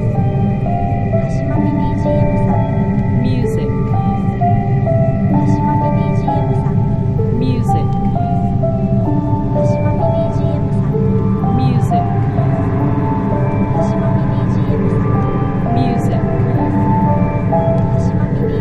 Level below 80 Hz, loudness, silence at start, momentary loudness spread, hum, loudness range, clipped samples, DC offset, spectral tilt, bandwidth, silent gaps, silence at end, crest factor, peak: -26 dBFS; -15 LUFS; 0 s; 2 LU; none; 1 LU; under 0.1%; under 0.1%; -10 dB/octave; 8.2 kHz; none; 0 s; 12 dB; -2 dBFS